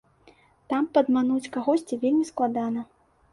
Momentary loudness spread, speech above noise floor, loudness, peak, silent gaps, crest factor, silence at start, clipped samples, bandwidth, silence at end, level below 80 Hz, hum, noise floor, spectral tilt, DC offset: 8 LU; 34 dB; -25 LUFS; -8 dBFS; none; 18 dB; 0.7 s; under 0.1%; 11.5 kHz; 0.5 s; -66 dBFS; none; -58 dBFS; -5.5 dB/octave; under 0.1%